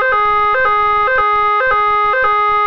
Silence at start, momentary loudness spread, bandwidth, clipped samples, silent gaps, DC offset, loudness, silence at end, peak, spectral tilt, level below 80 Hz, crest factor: 0 s; 0 LU; 5.4 kHz; under 0.1%; none; under 0.1%; -12 LUFS; 0 s; -2 dBFS; -4 dB/octave; -38 dBFS; 10 dB